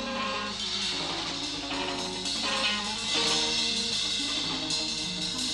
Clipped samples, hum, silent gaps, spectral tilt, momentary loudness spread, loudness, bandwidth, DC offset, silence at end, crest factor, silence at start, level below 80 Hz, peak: under 0.1%; none; none; -1.5 dB/octave; 6 LU; -28 LUFS; 12.5 kHz; under 0.1%; 0 s; 16 dB; 0 s; -54 dBFS; -14 dBFS